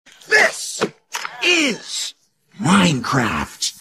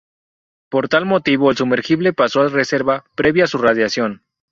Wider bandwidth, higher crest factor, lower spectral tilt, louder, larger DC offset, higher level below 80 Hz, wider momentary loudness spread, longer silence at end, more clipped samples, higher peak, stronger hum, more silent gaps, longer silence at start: first, 15.5 kHz vs 7.6 kHz; about the same, 18 dB vs 14 dB; second, -3.5 dB/octave vs -5.5 dB/octave; about the same, -18 LUFS vs -16 LUFS; neither; about the same, -50 dBFS vs -54 dBFS; first, 11 LU vs 6 LU; second, 0.1 s vs 0.35 s; neither; about the same, -2 dBFS vs -2 dBFS; neither; neither; second, 0.3 s vs 0.7 s